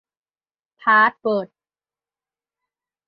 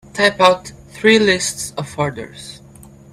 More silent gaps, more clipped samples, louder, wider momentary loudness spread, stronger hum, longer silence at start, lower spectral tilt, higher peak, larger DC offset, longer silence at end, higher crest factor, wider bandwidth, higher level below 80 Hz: neither; neither; about the same, -18 LUFS vs -16 LUFS; second, 12 LU vs 21 LU; neither; first, 0.85 s vs 0.15 s; first, -8 dB/octave vs -3.5 dB/octave; second, -4 dBFS vs 0 dBFS; neither; first, 1.65 s vs 0.55 s; about the same, 20 dB vs 18 dB; second, 5.6 kHz vs 14.5 kHz; second, -78 dBFS vs -52 dBFS